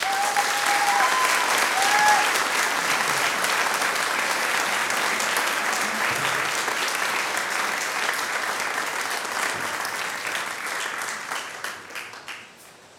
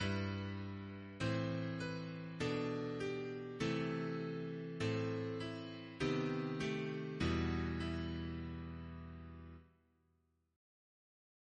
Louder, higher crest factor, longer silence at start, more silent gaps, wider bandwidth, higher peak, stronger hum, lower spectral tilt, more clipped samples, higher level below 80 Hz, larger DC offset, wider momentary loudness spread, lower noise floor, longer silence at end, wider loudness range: first, -22 LUFS vs -42 LUFS; about the same, 20 dB vs 18 dB; about the same, 0 s vs 0 s; neither; first, 19 kHz vs 10.5 kHz; first, -4 dBFS vs -24 dBFS; neither; second, 0 dB/octave vs -6.5 dB/octave; neither; second, -72 dBFS vs -58 dBFS; neither; about the same, 10 LU vs 11 LU; second, -48 dBFS vs -79 dBFS; second, 0.1 s vs 1.9 s; about the same, 7 LU vs 7 LU